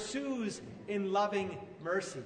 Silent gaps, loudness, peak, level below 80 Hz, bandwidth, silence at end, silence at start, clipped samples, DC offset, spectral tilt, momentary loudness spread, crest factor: none; -36 LUFS; -20 dBFS; -70 dBFS; 9.6 kHz; 0 s; 0 s; under 0.1%; under 0.1%; -4.5 dB/octave; 10 LU; 16 dB